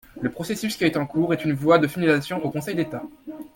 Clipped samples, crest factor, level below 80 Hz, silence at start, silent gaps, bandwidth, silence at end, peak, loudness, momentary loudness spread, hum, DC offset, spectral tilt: under 0.1%; 20 dB; -56 dBFS; 0.15 s; none; 17 kHz; 0.1 s; -4 dBFS; -23 LUFS; 12 LU; none; under 0.1%; -6 dB/octave